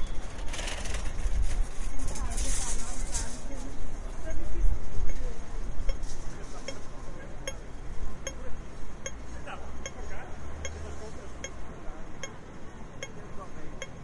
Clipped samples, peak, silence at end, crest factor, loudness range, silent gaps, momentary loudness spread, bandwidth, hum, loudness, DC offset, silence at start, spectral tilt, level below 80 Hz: under 0.1%; -8 dBFS; 0 s; 16 dB; 7 LU; none; 10 LU; 11.5 kHz; none; -39 LUFS; under 0.1%; 0 s; -3.5 dB/octave; -34 dBFS